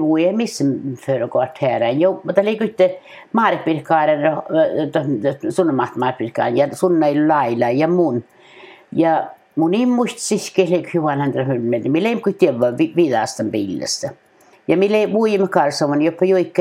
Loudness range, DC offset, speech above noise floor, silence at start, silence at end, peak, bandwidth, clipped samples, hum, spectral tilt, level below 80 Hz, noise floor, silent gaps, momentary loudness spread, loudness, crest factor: 1 LU; under 0.1%; 26 dB; 0 s; 0 s; 0 dBFS; 15 kHz; under 0.1%; none; -6 dB/octave; -68 dBFS; -43 dBFS; none; 6 LU; -18 LUFS; 18 dB